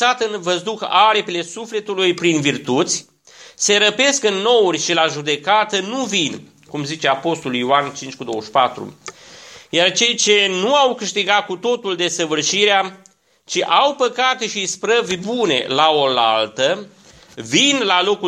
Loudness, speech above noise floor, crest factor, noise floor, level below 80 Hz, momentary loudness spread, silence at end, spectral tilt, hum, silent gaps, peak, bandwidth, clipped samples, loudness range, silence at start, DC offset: -17 LUFS; 23 dB; 18 dB; -41 dBFS; -66 dBFS; 11 LU; 0 s; -2 dB/octave; none; none; 0 dBFS; 12.5 kHz; under 0.1%; 3 LU; 0 s; under 0.1%